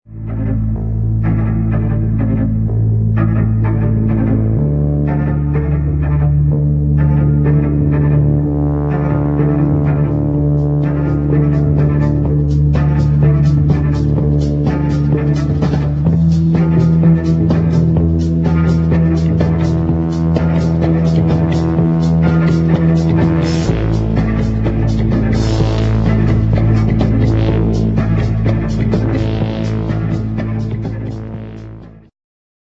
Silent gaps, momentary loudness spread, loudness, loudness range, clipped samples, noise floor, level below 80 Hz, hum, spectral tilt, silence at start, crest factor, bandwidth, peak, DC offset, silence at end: none; 5 LU; -14 LUFS; 3 LU; under 0.1%; -33 dBFS; -22 dBFS; none; -9.5 dB/octave; 0.1 s; 12 dB; 7.6 kHz; 0 dBFS; under 0.1%; 0.75 s